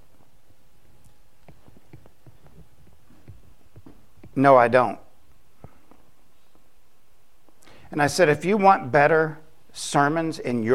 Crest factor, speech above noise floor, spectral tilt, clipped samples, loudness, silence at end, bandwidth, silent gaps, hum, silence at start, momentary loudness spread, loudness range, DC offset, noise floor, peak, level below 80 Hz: 24 dB; 44 dB; -5.5 dB/octave; under 0.1%; -20 LUFS; 0 s; 15.5 kHz; none; none; 3.3 s; 17 LU; 8 LU; 0.8%; -63 dBFS; -2 dBFS; -58 dBFS